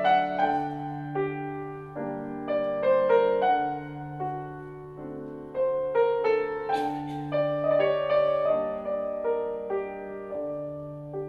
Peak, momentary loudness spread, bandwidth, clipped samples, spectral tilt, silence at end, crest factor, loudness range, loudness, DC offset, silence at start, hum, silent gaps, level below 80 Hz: -10 dBFS; 14 LU; 7 kHz; under 0.1%; -7.5 dB/octave; 0 s; 16 dB; 3 LU; -28 LUFS; under 0.1%; 0 s; none; none; -60 dBFS